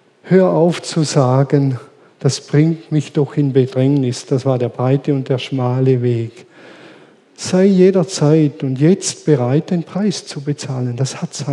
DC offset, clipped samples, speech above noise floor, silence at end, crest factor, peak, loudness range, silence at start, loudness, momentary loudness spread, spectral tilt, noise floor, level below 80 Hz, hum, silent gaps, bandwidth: under 0.1%; under 0.1%; 30 dB; 0 s; 16 dB; 0 dBFS; 3 LU; 0.25 s; -16 LUFS; 9 LU; -6.5 dB/octave; -45 dBFS; -72 dBFS; none; none; 11 kHz